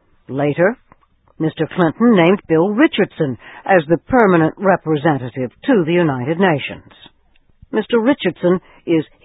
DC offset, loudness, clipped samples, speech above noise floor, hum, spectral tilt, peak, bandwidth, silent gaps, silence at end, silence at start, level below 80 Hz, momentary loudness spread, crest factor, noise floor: under 0.1%; -16 LUFS; under 0.1%; 37 dB; none; -10.5 dB/octave; 0 dBFS; 4 kHz; none; 0.2 s; 0.3 s; -52 dBFS; 10 LU; 16 dB; -52 dBFS